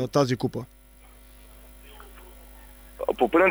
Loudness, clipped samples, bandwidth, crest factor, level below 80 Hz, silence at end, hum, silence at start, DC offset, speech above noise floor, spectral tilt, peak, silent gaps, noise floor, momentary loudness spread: -25 LUFS; under 0.1%; over 20 kHz; 18 dB; -50 dBFS; 0 s; 50 Hz at -50 dBFS; 0 s; under 0.1%; 28 dB; -6 dB/octave; -8 dBFS; none; -51 dBFS; 26 LU